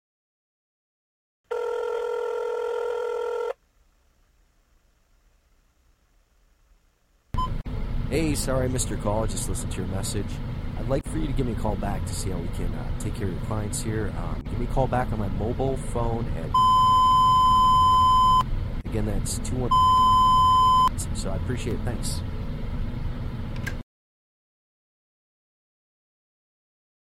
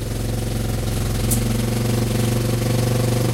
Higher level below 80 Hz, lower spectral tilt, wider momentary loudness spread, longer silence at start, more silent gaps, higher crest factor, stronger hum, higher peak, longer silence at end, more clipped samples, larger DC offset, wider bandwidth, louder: about the same, -34 dBFS vs -30 dBFS; about the same, -5 dB/octave vs -5.5 dB/octave; first, 15 LU vs 4 LU; first, 1.5 s vs 0 s; neither; about the same, 16 dB vs 14 dB; neither; second, -10 dBFS vs -6 dBFS; first, 3.35 s vs 0 s; neither; neither; about the same, 16 kHz vs 16 kHz; second, -24 LUFS vs -21 LUFS